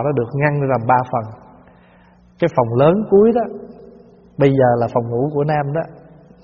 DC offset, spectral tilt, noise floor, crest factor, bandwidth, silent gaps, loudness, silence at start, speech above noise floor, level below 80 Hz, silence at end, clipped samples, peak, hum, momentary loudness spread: under 0.1%; -7.5 dB/octave; -49 dBFS; 18 dB; 6.8 kHz; none; -17 LUFS; 0 s; 33 dB; -50 dBFS; 0.5 s; under 0.1%; 0 dBFS; 60 Hz at -45 dBFS; 13 LU